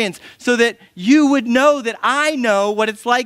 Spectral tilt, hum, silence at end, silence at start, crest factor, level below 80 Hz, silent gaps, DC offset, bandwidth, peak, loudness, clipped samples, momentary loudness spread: -3.5 dB/octave; none; 0 s; 0 s; 16 dB; -64 dBFS; none; under 0.1%; 15 kHz; 0 dBFS; -16 LUFS; under 0.1%; 7 LU